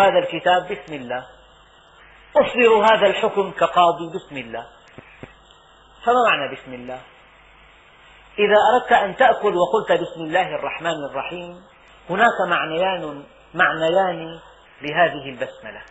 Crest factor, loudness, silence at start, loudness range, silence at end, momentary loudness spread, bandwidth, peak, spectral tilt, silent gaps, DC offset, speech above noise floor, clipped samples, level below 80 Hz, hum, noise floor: 20 dB; -19 LUFS; 0 s; 6 LU; 0.05 s; 18 LU; 8 kHz; -2 dBFS; -1.5 dB/octave; none; under 0.1%; 31 dB; under 0.1%; -56 dBFS; none; -50 dBFS